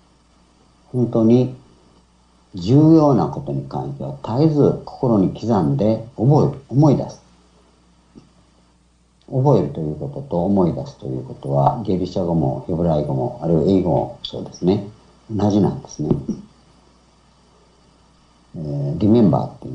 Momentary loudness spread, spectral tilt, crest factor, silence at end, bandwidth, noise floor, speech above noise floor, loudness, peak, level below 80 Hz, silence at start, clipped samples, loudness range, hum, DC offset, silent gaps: 14 LU; -9.5 dB/octave; 18 dB; 0 s; 7.8 kHz; -56 dBFS; 39 dB; -19 LUFS; -2 dBFS; -48 dBFS; 0.95 s; under 0.1%; 7 LU; none; under 0.1%; none